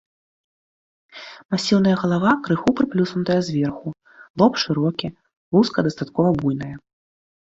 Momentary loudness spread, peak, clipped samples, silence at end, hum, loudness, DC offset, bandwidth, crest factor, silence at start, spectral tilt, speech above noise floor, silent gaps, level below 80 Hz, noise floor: 16 LU; -2 dBFS; under 0.1%; 0.7 s; none; -20 LUFS; under 0.1%; 7.8 kHz; 18 dB; 1.15 s; -6.5 dB/octave; over 70 dB; 1.45-1.49 s, 4.30-4.34 s, 5.37-5.51 s; -54 dBFS; under -90 dBFS